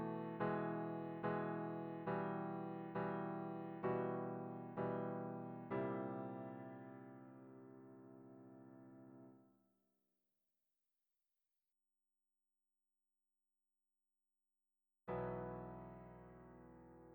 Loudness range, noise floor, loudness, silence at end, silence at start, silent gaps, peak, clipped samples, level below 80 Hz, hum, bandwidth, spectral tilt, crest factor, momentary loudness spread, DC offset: 19 LU; under -90 dBFS; -46 LUFS; 0 s; 0 s; none; -28 dBFS; under 0.1%; -76 dBFS; none; over 20 kHz; -10 dB/octave; 20 dB; 18 LU; under 0.1%